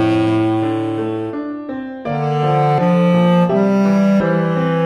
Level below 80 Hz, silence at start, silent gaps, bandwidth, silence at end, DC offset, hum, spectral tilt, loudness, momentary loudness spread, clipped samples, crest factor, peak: -52 dBFS; 0 s; none; 9 kHz; 0 s; under 0.1%; none; -8.5 dB/octave; -16 LUFS; 11 LU; under 0.1%; 12 dB; -4 dBFS